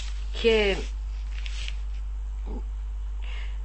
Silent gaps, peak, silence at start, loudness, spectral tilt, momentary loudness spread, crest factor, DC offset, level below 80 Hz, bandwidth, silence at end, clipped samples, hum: none; -10 dBFS; 0 s; -30 LUFS; -5 dB/octave; 13 LU; 18 dB; 0.4%; -32 dBFS; 8.6 kHz; 0 s; under 0.1%; none